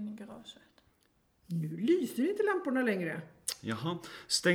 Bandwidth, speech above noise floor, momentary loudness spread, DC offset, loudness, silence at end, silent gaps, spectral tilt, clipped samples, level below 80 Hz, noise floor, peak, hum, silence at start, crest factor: 19.5 kHz; 40 dB; 15 LU; under 0.1%; -33 LUFS; 0 s; none; -4.5 dB/octave; under 0.1%; -74 dBFS; -72 dBFS; -12 dBFS; none; 0 s; 22 dB